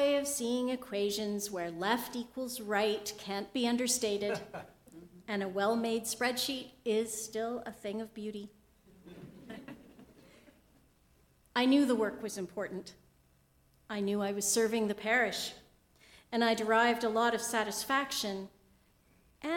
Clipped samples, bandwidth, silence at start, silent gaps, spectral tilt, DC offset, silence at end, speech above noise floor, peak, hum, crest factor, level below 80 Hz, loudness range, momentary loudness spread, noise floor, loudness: under 0.1%; 18 kHz; 0 s; none; -3 dB/octave; under 0.1%; 0 s; 35 dB; -14 dBFS; none; 20 dB; -70 dBFS; 9 LU; 18 LU; -68 dBFS; -33 LUFS